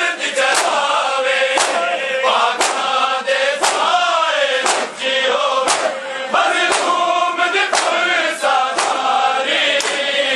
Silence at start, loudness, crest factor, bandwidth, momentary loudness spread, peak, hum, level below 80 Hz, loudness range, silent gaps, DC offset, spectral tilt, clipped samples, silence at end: 0 s; -15 LUFS; 16 dB; 12.5 kHz; 3 LU; 0 dBFS; none; -70 dBFS; 1 LU; none; under 0.1%; 0.5 dB/octave; under 0.1%; 0 s